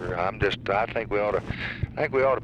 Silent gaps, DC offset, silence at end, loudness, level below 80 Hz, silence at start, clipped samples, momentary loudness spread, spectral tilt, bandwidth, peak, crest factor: none; under 0.1%; 0 s; -27 LUFS; -44 dBFS; 0 s; under 0.1%; 7 LU; -7 dB/octave; 8.8 kHz; -10 dBFS; 16 dB